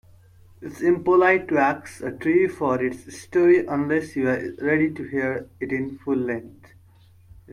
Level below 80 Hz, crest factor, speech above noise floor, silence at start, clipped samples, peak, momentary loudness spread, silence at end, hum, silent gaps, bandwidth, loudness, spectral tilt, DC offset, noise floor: -58 dBFS; 18 dB; 30 dB; 0.6 s; under 0.1%; -4 dBFS; 13 LU; 0 s; none; none; 11.5 kHz; -22 LUFS; -7 dB/octave; under 0.1%; -53 dBFS